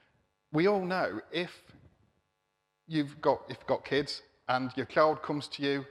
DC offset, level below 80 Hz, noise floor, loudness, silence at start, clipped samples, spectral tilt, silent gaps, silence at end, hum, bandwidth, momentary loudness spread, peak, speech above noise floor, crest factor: under 0.1%; -70 dBFS; -80 dBFS; -31 LUFS; 0.5 s; under 0.1%; -6 dB/octave; none; 0 s; none; 12 kHz; 9 LU; -12 dBFS; 49 dB; 22 dB